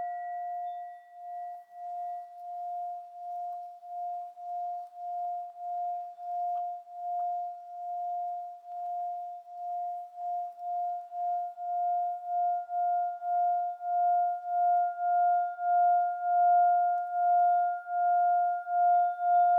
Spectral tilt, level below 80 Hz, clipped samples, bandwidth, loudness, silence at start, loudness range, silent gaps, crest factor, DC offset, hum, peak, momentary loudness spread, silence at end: -1.5 dB/octave; under -90 dBFS; under 0.1%; 2.1 kHz; -30 LUFS; 0 s; 12 LU; none; 12 dB; under 0.1%; none; -18 dBFS; 15 LU; 0 s